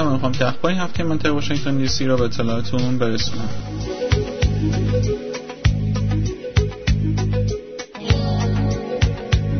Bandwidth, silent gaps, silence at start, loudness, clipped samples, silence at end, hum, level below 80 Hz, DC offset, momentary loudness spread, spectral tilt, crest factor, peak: 6.6 kHz; none; 0 s; -21 LUFS; under 0.1%; 0 s; none; -28 dBFS; under 0.1%; 6 LU; -6 dB/octave; 16 dB; -2 dBFS